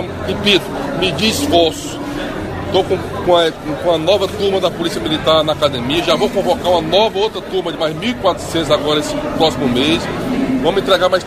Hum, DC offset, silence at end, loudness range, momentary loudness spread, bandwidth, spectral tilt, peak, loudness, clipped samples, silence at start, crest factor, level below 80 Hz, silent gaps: none; under 0.1%; 0 s; 1 LU; 7 LU; 15.5 kHz; -4.5 dB/octave; 0 dBFS; -15 LUFS; under 0.1%; 0 s; 16 dB; -38 dBFS; none